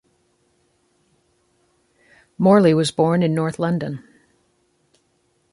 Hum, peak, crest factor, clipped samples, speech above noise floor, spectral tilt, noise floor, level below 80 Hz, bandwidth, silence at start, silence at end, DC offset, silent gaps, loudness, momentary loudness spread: none; -2 dBFS; 20 dB; under 0.1%; 48 dB; -7 dB/octave; -65 dBFS; -62 dBFS; 11.5 kHz; 2.4 s; 1.55 s; under 0.1%; none; -18 LUFS; 12 LU